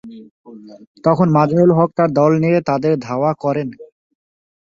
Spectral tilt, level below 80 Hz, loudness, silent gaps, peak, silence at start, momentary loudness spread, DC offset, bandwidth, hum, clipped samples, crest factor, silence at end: -9 dB/octave; -56 dBFS; -15 LUFS; 0.31-0.44 s, 0.87-0.95 s; -2 dBFS; 0.05 s; 8 LU; under 0.1%; 7.2 kHz; none; under 0.1%; 16 dB; 0.85 s